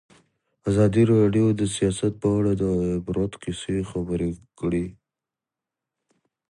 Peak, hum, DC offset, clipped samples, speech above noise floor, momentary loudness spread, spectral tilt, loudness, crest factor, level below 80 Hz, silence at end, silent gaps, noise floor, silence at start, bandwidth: -8 dBFS; none; under 0.1%; under 0.1%; 66 dB; 11 LU; -7 dB/octave; -23 LUFS; 16 dB; -46 dBFS; 1.6 s; none; -88 dBFS; 0.65 s; 11.5 kHz